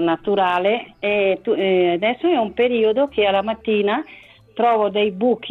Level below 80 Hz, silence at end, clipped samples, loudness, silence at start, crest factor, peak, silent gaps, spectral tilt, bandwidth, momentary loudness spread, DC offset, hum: -58 dBFS; 0 s; under 0.1%; -19 LUFS; 0 s; 12 dB; -6 dBFS; none; -7.5 dB/octave; 4.4 kHz; 4 LU; under 0.1%; none